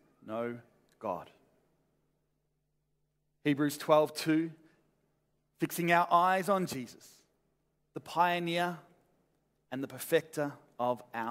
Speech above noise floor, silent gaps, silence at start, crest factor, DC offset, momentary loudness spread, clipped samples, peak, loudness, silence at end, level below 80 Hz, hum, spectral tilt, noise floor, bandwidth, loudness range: 48 dB; none; 0.25 s; 22 dB; under 0.1%; 15 LU; under 0.1%; -12 dBFS; -32 LUFS; 0 s; -80 dBFS; none; -5 dB/octave; -79 dBFS; 16 kHz; 9 LU